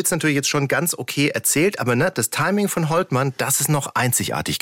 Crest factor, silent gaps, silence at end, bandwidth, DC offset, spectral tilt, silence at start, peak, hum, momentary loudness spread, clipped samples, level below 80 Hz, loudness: 12 dB; none; 0.05 s; 17 kHz; under 0.1%; -4 dB/octave; 0 s; -8 dBFS; none; 3 LU; under 0.1%; -56 dBFS; -20 LUFS